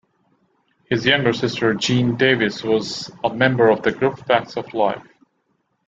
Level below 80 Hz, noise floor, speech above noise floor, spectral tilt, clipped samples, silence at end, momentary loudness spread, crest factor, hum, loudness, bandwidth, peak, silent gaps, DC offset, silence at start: -58 dBFS; -68 dBFS; 50 dB; -5 dB/octave; under 0.1%; 0.85 s; 8 LU; 18 dB; none; -19 LUFS; 7.8 kHz; -2 dBFS; none; under 0.1%; 0.9 s